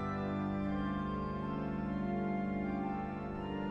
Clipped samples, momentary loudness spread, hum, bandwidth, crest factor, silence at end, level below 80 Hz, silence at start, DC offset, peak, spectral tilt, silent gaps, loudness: under 0.1%; 3 LU; 50 Hz at -65 dBFS; 6.4 kHz; 12 dB; 0 s; -52 dBFS; 0 s; under 0.1%; -26 dBFS; -9 dB/octave; none; -37 LUFS